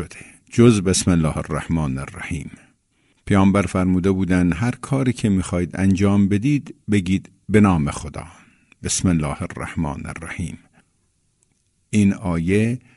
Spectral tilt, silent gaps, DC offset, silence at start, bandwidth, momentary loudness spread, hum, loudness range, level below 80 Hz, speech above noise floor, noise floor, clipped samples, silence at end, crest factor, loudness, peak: -6 dB/octave; none; under 0.1%; 0 s; 11.5 kHz; 14 LU; none; 7 LU; -40 dBFS; 46 dB; -65 dBFS; under 0.1%; 0.2 s; 18 dB; -20 LUFS; -2 dBFS